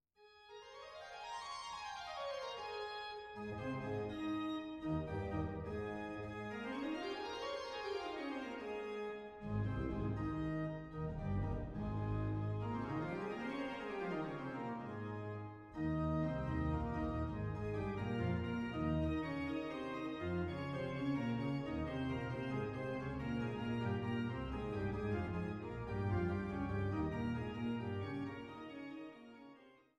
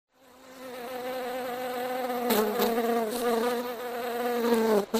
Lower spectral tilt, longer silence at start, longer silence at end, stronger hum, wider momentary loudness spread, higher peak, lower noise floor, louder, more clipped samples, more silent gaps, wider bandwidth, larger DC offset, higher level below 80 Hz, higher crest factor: first, -7.5 dB/octave vs -4 dB/octave; second, 0.2 s vs 0.4 s; first, 0.25 s vs 0 s; neither; second, 8 LU vs 11 LU; second, -24 dBFS vs -10 dBFS; first, -65 dBFS vs -52 dBFS; second, -42 LUFS vs -29 LUFS; neither; neither; second, 10 kHz vs 15.5 kHz; neither; first, -54 dBFS vs -66 dBFS; about the same, 16 dB vs 20 dB